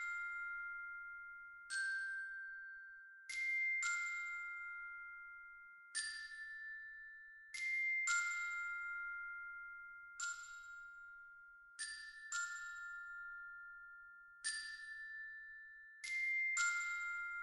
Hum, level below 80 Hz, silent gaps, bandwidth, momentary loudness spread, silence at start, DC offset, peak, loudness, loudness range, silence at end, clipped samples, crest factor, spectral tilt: none; -80 dBFS; none; 13.5 kHz; 18 LU; 0 s; under 0.1%; -26 dBFS; -43 LUFS; 7 LU; 0 s; under 0.1%; 20 dB; 4.5 dB/octave